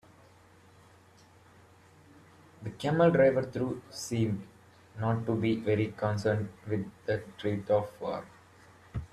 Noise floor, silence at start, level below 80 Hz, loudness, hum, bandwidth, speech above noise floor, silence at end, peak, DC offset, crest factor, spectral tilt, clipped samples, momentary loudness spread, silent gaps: -59 dBFS; 2.6 s; -60 dBFS; -30 LUFS; none; 13.5 kHz; 29 dB; 0.05 s; -12 dBFS; under 0.1%; 20 dB; -7 dB/octave; under 0.1%; 15 LU; none